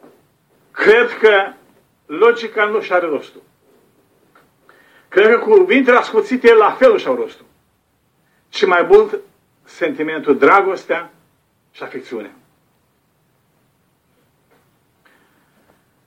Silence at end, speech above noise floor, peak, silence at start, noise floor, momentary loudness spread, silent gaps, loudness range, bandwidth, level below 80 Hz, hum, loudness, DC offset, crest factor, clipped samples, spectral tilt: 3.8 s; 48 dB; 0 dBFS; 0.75 s; -62 dBFS; 18 LU; none; 14 LU; 8.6 kHz; -58 dBFS; none; -14 LUFS; under 0.1%; 16 dB; under 0.1%; -4.5 dB/octave